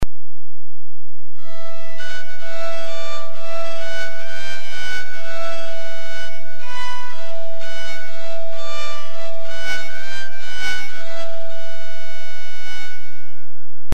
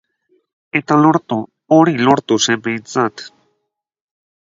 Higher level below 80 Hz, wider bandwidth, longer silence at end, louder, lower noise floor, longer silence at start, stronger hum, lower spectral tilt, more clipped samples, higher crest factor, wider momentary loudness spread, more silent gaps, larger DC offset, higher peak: first, -46 dBFS vs -60 dBFS; first, 13.5 kHz vs 7.8 kHz; second, 0 s vs 1.15 s; second, -31 LUFS vs -15 LUFS; second, -70 dBFS vs -74 dBFS; second, 0 s vs 0.75 s; neither; about the same, -4 dB/octave vs -4.5 dB/octave; neither; first, 24 dB vs 16 dB; about the same, 9 LU vs 11 LU; neither; first, 50% vs under 0.1%; second, -4 dBFS vs 0 dBFS